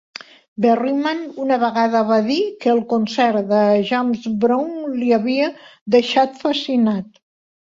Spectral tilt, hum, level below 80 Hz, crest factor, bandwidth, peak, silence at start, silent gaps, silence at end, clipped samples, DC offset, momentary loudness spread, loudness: -6 dB/octave; none; -64 dBFS; 16 dB; 7.6 kHz; -2 dBFS; 0.6 s; 5.81-5.86 s; 0.7 s; under 0.1%; under 0.1%; 8 LU; -18 LUFS